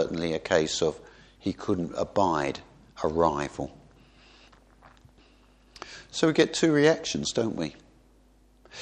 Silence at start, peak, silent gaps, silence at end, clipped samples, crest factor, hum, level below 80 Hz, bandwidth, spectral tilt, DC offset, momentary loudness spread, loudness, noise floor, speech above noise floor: 0 s; -6 dBFS; none; 0 s; under 0.1%; 22 dB; none; -54 dBFS; 9.8 kHz; -4.5 dB/octave; under 0.1%; 18 LU; -27 LUFS; -59 dBFS; 33 dB